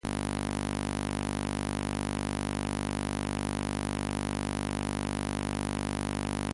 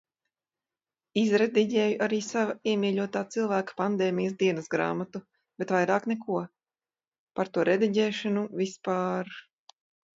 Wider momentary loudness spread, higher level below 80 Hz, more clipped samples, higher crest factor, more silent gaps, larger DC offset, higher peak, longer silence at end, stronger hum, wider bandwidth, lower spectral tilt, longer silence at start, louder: second, 0 LU vs 10 LU; first, -42 dBFS vs -76 dBFS; neither; about the same, 16 dB vs 18 dB; second, none vs 7.18-7.27 s; neither; second, -18 dBFS vs -10 dBFS; second, 0 s vs 0.75 s; neither; first, 11.5 kHz vs 7.8 kHz; about the same, -5 dB/octave vs -5.5 dB/octave; second, 0.05 s vs 1.15 s; second, -33 LUFS vs -28 LUFS